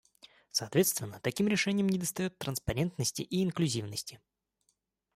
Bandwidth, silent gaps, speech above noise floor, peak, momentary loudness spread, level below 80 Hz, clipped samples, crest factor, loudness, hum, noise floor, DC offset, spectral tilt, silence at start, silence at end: 16 kHz; none; 46 dB; -16 dBFS; 8 LU; -58 dBFS; under 0.1%; 18 dB; -32 LUFS; none; -78 dBFS; under 0.1%; -4.5 dB/octave; 0.25 s; 1 s